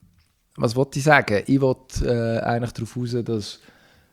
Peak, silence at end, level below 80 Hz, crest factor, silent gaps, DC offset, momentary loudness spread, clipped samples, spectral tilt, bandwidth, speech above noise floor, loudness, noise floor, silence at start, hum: -2 dBFS; 0.55 s; -40 dBFS; 22 dB; none; under 0.1%; 12 LU; under 0.1%; -6 dB/octave; 15 kHz; 39 dB; -22 LUFS; -60 dBFS; 0.55 s; none